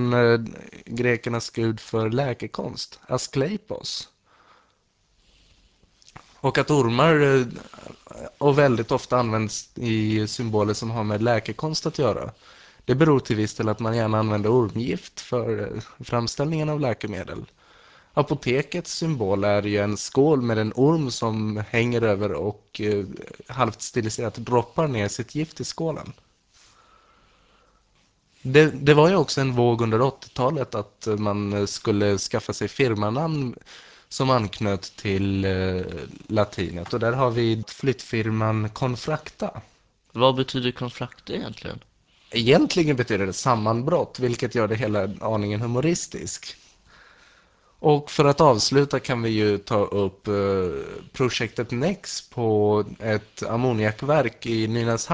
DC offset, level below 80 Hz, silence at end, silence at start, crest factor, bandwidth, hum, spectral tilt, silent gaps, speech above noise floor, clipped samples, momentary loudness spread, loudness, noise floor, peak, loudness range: under 0.1%; -50 dBFS; 0 s; 0 s; 22 dB; 8 kHz; none; -5.5 dB/octave; none; 43 dB; under 0.1%; 13 LU; -23 LUFS; -66 dBFS; -2 dBFS; 6 LU